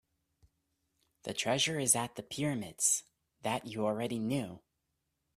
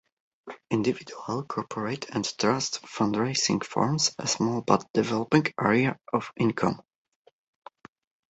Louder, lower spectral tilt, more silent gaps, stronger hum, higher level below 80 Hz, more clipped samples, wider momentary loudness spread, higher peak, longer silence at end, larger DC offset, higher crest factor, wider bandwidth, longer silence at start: second, -33 LUFS vs -27 LUFS; second, -3 dB/octave vs -4.5 dB/octave; second, none vs 4.90-4.94 s; neither; second, -72 dBFS vs -64 dBFS; neither; about the same, 11 LU vs 9 LU; second, -12 dBFS vs -6 dBFS; second, 0.8 s vs 1.5 s; neither; about the same, 24 dB vs 22 dB; first, 15.5 kHz vs 8.2 kHz; first, 1.25 s vs 0.45 s